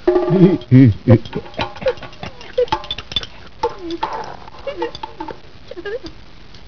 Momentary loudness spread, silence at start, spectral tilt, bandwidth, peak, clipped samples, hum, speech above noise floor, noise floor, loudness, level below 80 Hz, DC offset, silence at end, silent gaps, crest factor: 21 LU; 0.05 s; -8 dB/octave; 5.4 kHz; 0 dBFS; 0.1%; none; 29 dB; -41 dBFS; -17 LUFS; -42 dBFS; 2%; 0.55 s; none; 18 dB